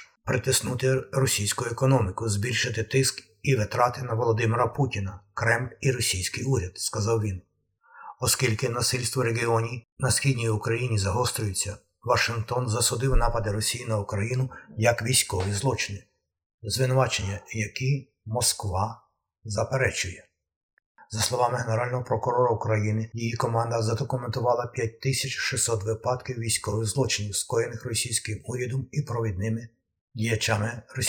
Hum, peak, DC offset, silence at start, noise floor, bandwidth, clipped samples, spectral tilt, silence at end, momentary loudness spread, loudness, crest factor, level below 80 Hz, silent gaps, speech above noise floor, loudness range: none; -6 dBFS; under 0.1%; 0 s; -60 dBFS; 20 kHz; under 0.1%; -4 dB/octave; 0 s; 8 LU; -26 LUFS; 20 dB; -42 dBFS; 9.92-9.97 s, 16.46-16.58 s, 20.56-20.77 s, 20.86-20.95 s, 30.01-30.08 s; 34 dB; 3 LU